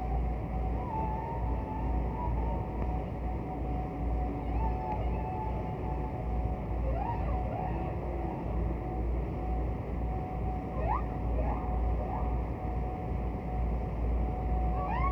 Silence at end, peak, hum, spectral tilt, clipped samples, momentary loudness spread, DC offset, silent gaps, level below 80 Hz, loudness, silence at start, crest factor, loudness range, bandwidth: 0 s; -18 dBFS; none; -10 dB/octave; under 0.1%; 3 LU; under 0.1%; none; -34 dBFS; -34 LUFS; 0 s; 12 dB; 1 LU; 3.3 kHz